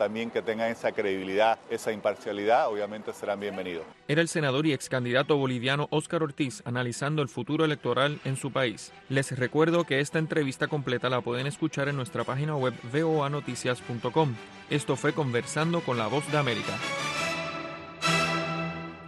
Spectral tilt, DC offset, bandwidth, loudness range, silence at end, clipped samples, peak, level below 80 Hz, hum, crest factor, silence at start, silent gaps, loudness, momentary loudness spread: -5 dB/octave; under 0.1%; 12.5 kHz; 2 LU; 0 s; under 0.1%; -10 dBFS; -66 dBFS; none; 18 dB; 0 s; none; -28 LUFS; 7 LU